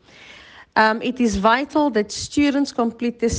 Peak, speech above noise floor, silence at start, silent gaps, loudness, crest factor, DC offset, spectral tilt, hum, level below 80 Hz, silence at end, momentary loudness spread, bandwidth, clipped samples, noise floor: -4 dBFS; 25 dB; 0.3 s; none; -20 LUFS; 16 dB; under 0.1%; -4.5 dB/octave; none; -44 dBFS; 0 s; 6 LU; 9.8 kHz; under 0.1%; -45 dBFS